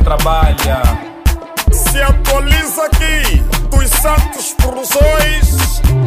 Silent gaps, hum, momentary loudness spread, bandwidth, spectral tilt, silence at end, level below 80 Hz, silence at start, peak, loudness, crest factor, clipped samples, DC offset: none; none; 5 LU; 16 kHz; -4 dB/octave; 0 s; -12 dBFS; 0 s; 0 dBFS; -13 LUFS; 10 dB; under 0.1%; 0.4%